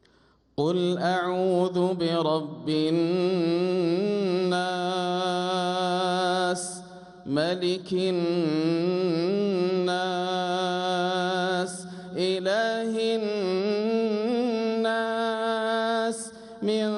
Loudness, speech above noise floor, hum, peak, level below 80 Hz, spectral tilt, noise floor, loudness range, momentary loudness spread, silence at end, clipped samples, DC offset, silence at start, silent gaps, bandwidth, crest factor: -26 LUFS; 36 dB; none; -12 dBFS; -70 dBFS; -5.5 dB/octave; -62 dBFS; 2 LU; 5 LU; 0 s; under 0.1%; under 0.1%; 0.6 s; none; 11.5 kHz; 14 dB